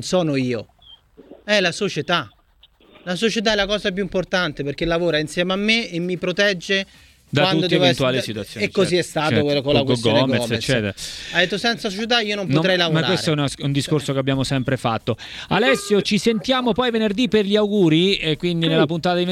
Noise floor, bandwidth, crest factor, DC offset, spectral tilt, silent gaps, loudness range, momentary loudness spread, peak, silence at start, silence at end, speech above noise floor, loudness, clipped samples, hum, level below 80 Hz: -55 dBFS; 15 kHz; 18 dB; under 0.1%; -5 dB/octave; none; 4 LU; 7 LU; -2 dBFS; 0 s; 0 s; 35 dB; -19 LUFS; under 0.1%; none; -48 dBFS